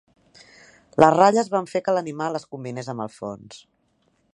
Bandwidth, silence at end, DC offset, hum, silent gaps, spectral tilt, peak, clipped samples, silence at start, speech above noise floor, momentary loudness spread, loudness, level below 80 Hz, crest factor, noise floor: 11 kHz; 0.8 s; under 0.1%; none; none; -5.5 dB/octave; 0 dBFS; under 0.1%; 1 s; 45 dB; 18 LU; -21 LUFS; -64 dBFS; 22 dB; -67 dBFS